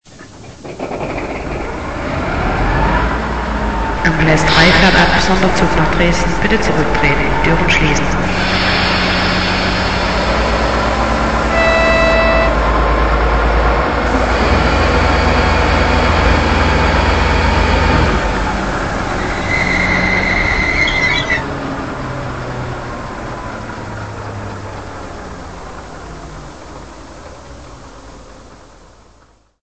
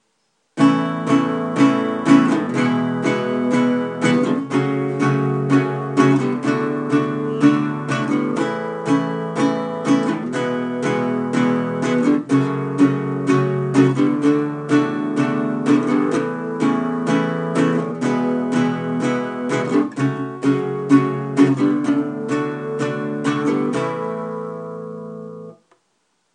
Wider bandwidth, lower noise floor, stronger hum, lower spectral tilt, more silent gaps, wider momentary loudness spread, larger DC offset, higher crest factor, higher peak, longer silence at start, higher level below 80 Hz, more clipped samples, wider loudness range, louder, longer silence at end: second, 8.6 kHz vs 10 kHz; second, -50 dBFS vs -67 dBFS; neither; second, -5 dB/octave vs -7 dB/octave; neither; first, 17 LU vs 7 LU; first, 1% vs under 0.1%; about the same, 14 dB vs 18 dB; about the same, 0 dBFS vs 0 dBFS; second, 0 s vs 0.55 s; first, -22 dBFS vs -68 dBFS; neither; first, 16 LU vs 3 LU; first, -14 LUFS vs -19 LUFS; second, 0 s vs 0.8 s